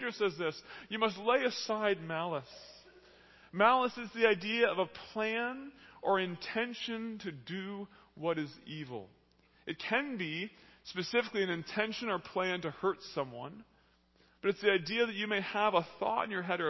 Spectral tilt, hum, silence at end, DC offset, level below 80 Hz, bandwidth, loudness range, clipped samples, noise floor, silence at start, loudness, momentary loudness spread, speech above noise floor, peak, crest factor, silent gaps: -5 dB/octave; none; 0 s; under 0.1%; -74 dBFS; 6.2 kHz; 7 LU; under 0.1%; -69 dBFS; 0 s; -34 LUFS; 15 LU; 34 dB; -12 dBFS; 24 dB; none